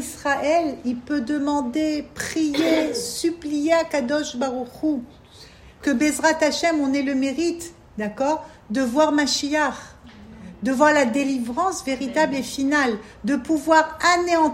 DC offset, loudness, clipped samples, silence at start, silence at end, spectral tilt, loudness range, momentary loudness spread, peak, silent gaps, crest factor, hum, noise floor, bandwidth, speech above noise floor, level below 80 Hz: under 0.1%; -22 LUFS; under 0.1%; 0 s; 0 s; -3.5 dB/octave; 2 LU; 10 LU; -2 dBFS; none; 20 dB; none; -46 dBFS; 16 kHz; 24 dB; -54 dBFS